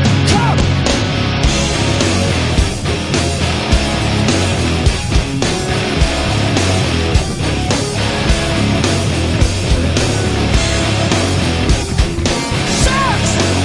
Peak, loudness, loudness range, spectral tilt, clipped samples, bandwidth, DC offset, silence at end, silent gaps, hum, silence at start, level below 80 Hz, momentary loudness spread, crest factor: 0 dBFS; -14 LUFS; 1 LU; -4.5 dB/octave; under 0.1%; 11.5 kHz; under 0.1%; 0 s; none; none; 0 s; -22 dBFS; 3 LU; 14 dB